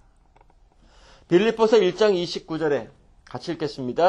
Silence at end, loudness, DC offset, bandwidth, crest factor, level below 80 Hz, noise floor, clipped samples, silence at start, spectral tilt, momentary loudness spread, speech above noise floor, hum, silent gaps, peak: 0 s; -22 LUFS; under 0.1%; 9.6 kHz; 18 dB; -56 dBFS; -56 dBFS; under 0.1%; 1.3 s; -5.5 dB/octave; 13 LU; 35 dB; none; none; -4 dBFS